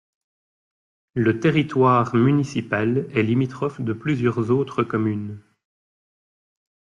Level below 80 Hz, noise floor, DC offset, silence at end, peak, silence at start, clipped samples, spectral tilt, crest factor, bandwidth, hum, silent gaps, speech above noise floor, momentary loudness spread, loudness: -60 dBFS; under -90 dBFS; under 0.1%; 1.6 s; -6 dBFS; 1.15 s; under 0.1%; -8 dB/octave; 16 dB; 10 kHz; none; none; over 69 dB; 9 LU; -21 LUFS